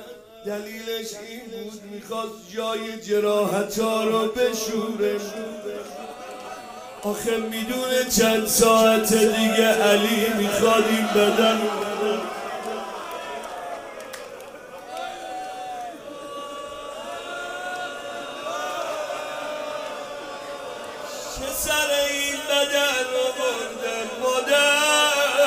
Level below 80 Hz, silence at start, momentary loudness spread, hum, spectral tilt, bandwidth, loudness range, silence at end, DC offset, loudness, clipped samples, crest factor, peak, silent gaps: -54 dBFS; 0 s; 18 LU; none; -2.5 dB/octave; 16 kHz; 15 LU; 0 s; under 0.1%; -23 LUFS; under 0.1%; 20 dB; -4 dBFS; none